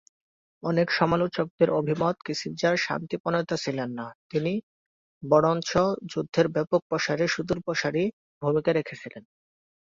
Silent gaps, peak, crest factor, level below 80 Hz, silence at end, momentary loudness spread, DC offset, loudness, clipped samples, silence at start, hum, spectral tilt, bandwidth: 1.50-1.58 s, 3.20-3.24 s, 4.15-4.30 s, 4.63-5.21 s, 6.82-6.90 s, 8.13-8.41 s; -8 dBFS; 20 dB; -60 dBFS; 0.7 s; 9 LU; under 0.1%; -26 LUFS; under 0.1%; 0.65 s; none; -5.5 dB/octave; 7.6 kHz